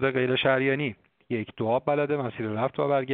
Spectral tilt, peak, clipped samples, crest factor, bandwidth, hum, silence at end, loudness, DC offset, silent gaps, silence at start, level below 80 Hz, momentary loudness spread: -4 dB/octave; -8 dBFS; under 0.1%; 18 dB; 4.6 kHz; none; 0 s; -26 LUFS; under 0.1%; none; 0 s; -66 dBFS; 10 LU